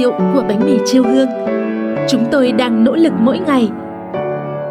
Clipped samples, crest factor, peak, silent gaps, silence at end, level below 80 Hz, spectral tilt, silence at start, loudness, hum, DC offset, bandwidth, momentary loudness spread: under 0.1%; 12 dB; -2 dBFS; none; 0 s; -54 dBFS; -6 dB/octave; 0 s; -14 LUFS; none; under 0.1%; 13.5 kHz; 9 LU